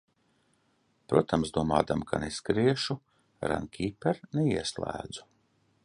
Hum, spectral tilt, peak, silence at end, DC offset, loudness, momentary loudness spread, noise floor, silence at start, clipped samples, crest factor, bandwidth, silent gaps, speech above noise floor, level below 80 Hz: none; -5.5 dB/octave; -6 dBFS; 0.65 s; under 0.1%; -30 LUFS; 10 LU; -71 dBFS; 1.1 s; under 0.1%; 24 dB; 11 kHz; none; 42 dB; -52 dBFS